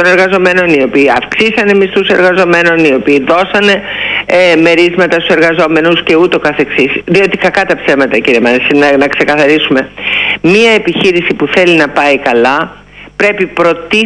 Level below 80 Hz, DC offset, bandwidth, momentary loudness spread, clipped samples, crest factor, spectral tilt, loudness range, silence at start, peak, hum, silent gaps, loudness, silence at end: -42 dBFS; under 0.1%; 10.5 kHz; 4 LU; 0.1%; 8 dB; -5 dB/octave; 1 LU; 0 s; 0 dBFS; 50 Hz at -40 dBFS; none; -8 LUFS; 0 s